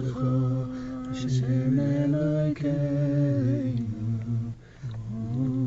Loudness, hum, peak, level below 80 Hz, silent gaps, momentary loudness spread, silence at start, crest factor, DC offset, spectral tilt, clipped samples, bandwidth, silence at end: -27 LUFS; none; -14 dBFS; -50 dBFS; none; 10 LU; 0 s; 12 dB; under 0.1%; -9 dB/octave; under 0.1%; 7.8 kHz; 0 s